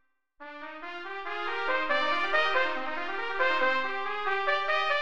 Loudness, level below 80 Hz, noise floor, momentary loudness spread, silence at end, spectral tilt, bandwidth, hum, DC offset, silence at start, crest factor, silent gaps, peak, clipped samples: -28 LUFS; -64 dBFS; -50 dBFS; 15 LU; 0 s; -2.5 dB/octave; 9.2 kHz; none; 1%; 0 s; 16 dB; none; -14 dBFS; under 0.1%